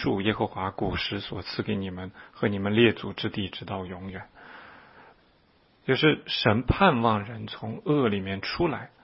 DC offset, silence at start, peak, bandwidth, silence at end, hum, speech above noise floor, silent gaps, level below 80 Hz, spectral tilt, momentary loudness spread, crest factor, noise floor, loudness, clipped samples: under 0.1%; 0 s; -4 dBFS; 5.8 kHz; 0.15 s; none; 36 dB; none; -48 dBFS; -9.5 dB/octave; 17 LU; 22 dB; -62 dBFS; -27 LUFS; under 0.1%